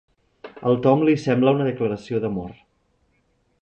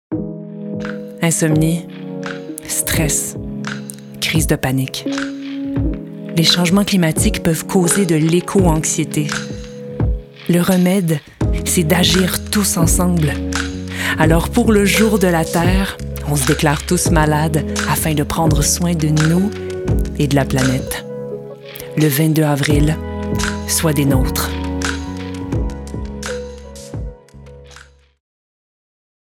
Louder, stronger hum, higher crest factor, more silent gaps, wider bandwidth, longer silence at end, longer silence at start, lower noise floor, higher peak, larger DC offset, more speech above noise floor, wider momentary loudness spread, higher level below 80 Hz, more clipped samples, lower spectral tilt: second, -21 LUFS vs -16 LUFS; neither; about the same, 18 dB vs 16 dB; neither; second, 8.4 kHz vs 18 kHz; second, 1.1 s vs 1.4 s; first, 0.45 s vs 0.1 s; first, -66 dBFS vs -43 dBFS; second, -4 dBFS vs 0 dBFS; neither; first, 46 dB vs 28 dB; second, 11 LU vs 14 LU; second, -56 dBFS vs -28 dBFS; neither; first, -8 dB/octave vs -4.5 dB/octave